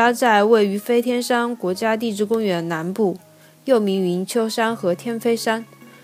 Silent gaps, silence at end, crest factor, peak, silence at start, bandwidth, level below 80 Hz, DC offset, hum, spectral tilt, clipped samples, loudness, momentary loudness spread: none; 0.15 s; 18 dB; -2 dBFS; 0 s; 16 kHz; -74 dBFS; under 0.1%; none; -5 dB/octave; under 0.1%; -20 LUFS; 8 LU